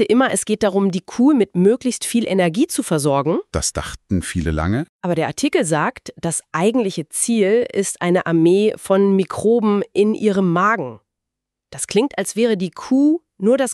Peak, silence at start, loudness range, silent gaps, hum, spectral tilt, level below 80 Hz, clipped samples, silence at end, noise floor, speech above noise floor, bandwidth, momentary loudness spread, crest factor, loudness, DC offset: -4 dBFS; 0 s; 4 LU; 4.89-4.99 s; none; -5 dB/octave; -42 dBFS; under 0.1%; 0 s; -82 dBFS; 64 dB; 13.5 kHz; 7 LU; 14 dB; -18 LUFS; under 0.1%